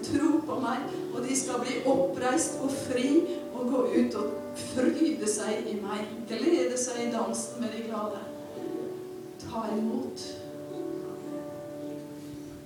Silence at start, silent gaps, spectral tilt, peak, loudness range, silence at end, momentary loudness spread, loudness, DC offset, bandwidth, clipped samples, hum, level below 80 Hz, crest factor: 0 s; none; -4 dB/octave; -12 dBFS; 8 LU; 0 s; 13 LU; -30 LUFS; under 0.1%; 18.5 kHz; under 0.1%; none; -66 dBFS; 18 dB